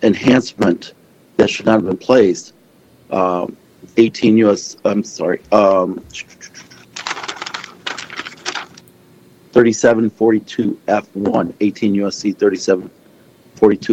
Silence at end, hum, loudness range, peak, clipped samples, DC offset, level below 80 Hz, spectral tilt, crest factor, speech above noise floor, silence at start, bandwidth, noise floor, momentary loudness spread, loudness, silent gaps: 0 s; none; 6 LU; 0 dBFS; under 0.1%; under 0.1%; -54 dBFS; -5.5 dB/octave; 16 dB; 35 dB; 0 s; 8.8 kHz; -49 dBFS; 15 LU; -16 LUFS; none